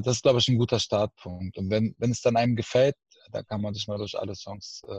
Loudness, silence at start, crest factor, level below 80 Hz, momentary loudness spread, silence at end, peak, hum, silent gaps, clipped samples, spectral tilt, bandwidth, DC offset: -26 LUFS; 0 s; 18 dB; -60 dBFS; 15 LU; 0 s; -8 dBFS; none; none; under 0.1%; -5.5 dB/octave; 8.6 kHz; under 0.1%